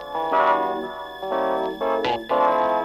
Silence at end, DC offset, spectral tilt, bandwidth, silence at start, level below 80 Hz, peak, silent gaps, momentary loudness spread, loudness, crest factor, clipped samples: 0 s; under 0.1%; -5 dB/octave; 15.5 kHz; 0 s; -56 dBFS; -8 dBFS; none; 10 LU; -22 LUFS; 14 dB; under 0.1%